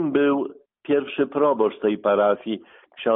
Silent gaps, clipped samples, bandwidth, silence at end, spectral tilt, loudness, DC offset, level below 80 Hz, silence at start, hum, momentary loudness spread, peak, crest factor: none; under 0.1%; 3.9 kHz; 0 s; -4.5 dB/octave; -22 LUFS; under 0.1%; -66 dBFS; 0 s; none; 12 LU; -8 dBFS; 14 dB